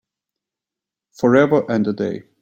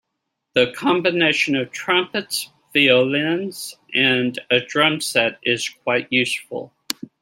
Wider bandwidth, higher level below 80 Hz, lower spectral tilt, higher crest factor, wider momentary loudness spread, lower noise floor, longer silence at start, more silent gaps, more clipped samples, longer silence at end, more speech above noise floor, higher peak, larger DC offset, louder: second, 8.4 kHz vs 16.5 kHz; first, -60 dBFS vs -66 dBFS; first, -7.5 dB/octave vs -3.5 dB/octave; about the same, 16 dB vs 20 dB; about the same, 10 LU vs 11 LU; first, -87 dBFS vs -78 dBFS; first, 1.2 s vs 0.55 s; neither; neither; second, 0.2 s vs 0.55 s; first, 70 dB vs 58 dB; about the same, -2 dBFS vs 0 dBFS; neither; about the same, -18 LUFS vs -19 LUFS